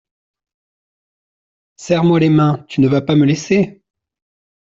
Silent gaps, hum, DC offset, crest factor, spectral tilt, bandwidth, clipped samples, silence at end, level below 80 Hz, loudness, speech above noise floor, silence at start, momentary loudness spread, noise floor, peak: none; none; under 0.1%; 16 dB; -7 dB/octave; 7.8 kHz; under 0.1%; 0.95 s; -54 dBFS; -14 LUFS; over 77 dB; 1.8 s; 5 LU; under -90 dBFS; -2 dBFS